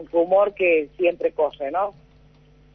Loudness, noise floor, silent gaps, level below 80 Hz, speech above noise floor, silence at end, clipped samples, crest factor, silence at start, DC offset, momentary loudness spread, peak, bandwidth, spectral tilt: -21 LUFS; -53 dBFS; none; -56 dBFS; 31 dB; 0.85 s; under 0.1%; 14 dB; 0 s; under 0.1%; 7 LU; -8 dBFS; 3.8 kHz; -7.5 dB/octave